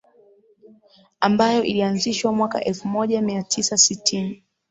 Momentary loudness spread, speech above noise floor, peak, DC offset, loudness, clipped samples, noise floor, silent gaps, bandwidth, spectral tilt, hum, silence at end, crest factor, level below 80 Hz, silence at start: 8 LU; 34 dB; -2 dBFS; under 0.1%; -20 LUFS; under 0.1%; -55 dBFS; none; 8.2 kHz; -3 dB/octave; none; 0.35 s; 20 dB; -62 dBFS; 1.2 s